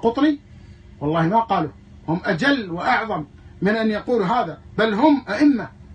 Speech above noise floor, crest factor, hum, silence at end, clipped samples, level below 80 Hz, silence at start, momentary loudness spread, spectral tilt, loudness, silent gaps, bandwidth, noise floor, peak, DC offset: 23 dB; 18 dB; none; 0 s; under 0.1%; -50 dBFS; 0 s; 11 LU; -7 dB/octave; -21 LUFS; none; 9 kHz; -43 dBFS; -4 dBFS; under 0.1%